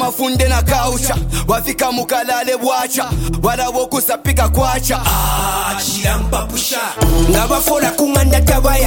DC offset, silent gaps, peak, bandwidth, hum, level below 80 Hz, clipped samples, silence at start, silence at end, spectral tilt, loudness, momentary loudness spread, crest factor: under 0.1%; none; 0 dBFS; 17 kHz; none; -20 dBFS; under 0.1%; 0 s; 0 s; -4 dB/octave; -15 LUFS; 4 LU; 14 dB